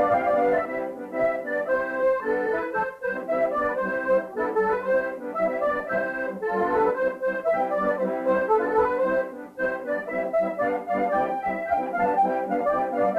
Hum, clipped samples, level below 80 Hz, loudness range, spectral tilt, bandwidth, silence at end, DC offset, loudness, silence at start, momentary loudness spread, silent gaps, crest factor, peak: none; under 0.1%; -58 dBFS; 2 LU; -7.5 dB/octave; 7 kHz; 0 s; under 0.1%; -25 LUFS; 0 s; 6 LU; none; 14 dB; -10 dBFS